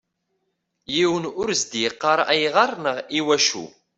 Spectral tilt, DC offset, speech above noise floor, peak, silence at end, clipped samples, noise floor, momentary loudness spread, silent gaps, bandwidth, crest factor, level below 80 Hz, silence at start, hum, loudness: -2.5 dB/octave; under 0.1%; 53 dB; -2 dBFS; 0.3 s; under 0.1%; -75 dBFS; 7 LU; none; 8.4 kHz; 20 dB; -64 dBFS; 0.9 s; none; -21 LUFS